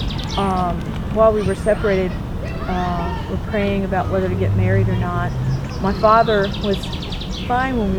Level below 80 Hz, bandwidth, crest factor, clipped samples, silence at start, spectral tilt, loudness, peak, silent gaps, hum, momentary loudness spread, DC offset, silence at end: -30 dBFS; 17 kHz; 18 dB; under 0.1%; 0 s; -7 dB/octave; -19 LUFS; -2 dBFS; none; none; 10 LU; under 0.1%; 0 s